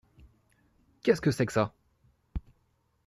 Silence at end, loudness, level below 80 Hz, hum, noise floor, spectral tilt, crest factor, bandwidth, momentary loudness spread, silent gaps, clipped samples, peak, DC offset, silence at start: 0.7 s; -29 LUFS; -52 dBFS; none; -72 dBFS; -6.5 dB/octave; 22 dB; 14 kHz; 17 LU; none; under 0.1%; -10 dBFS; under 0.1%; 1.05 s